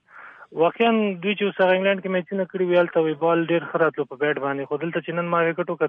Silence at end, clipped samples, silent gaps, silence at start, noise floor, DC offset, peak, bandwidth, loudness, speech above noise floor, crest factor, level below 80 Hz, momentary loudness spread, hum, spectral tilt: 0 s; under 0.1%; none; 0.15 s; -45 dBFS; under 0.1%; -8 dBFS; 4.2 kHz; -22 LUFS; 23 dB; 16 dB; -74 dBFS; 7 LU; none; -9 dB/octave